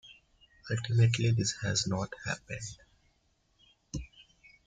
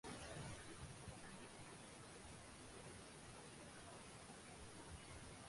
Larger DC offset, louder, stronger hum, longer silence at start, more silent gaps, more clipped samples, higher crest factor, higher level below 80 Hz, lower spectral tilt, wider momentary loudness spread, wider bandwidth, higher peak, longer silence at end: neither; first, -31 LUFS vs -57 LUFS; neither; about the same, 0.05 s vs 0.05 s; neither; neither; about the same, 20 dB vs 16 dB; first, -56 dBFS vs -68 dBFS; about the same, -4.5 dB/octave vs -3.5 dB/octave; first, 17 LU vs 5 LU; second, 9.4 kHz vs 11.5 kHz; first, -14 dBFS vs -40 dBFS; first, 0.45 s vs 0 s